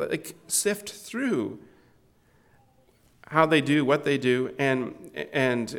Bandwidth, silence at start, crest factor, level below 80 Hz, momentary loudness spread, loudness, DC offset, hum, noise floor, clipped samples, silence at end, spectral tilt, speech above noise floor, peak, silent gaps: 19 kHz; 0 s; 22 dB; -68 dBFS; 14 LU; -26 LUFS; under 0.1%; none; -62 dBFS; under 0.1%; 0 s; -4 dB/octave; 36 dB; -4 dBFS; none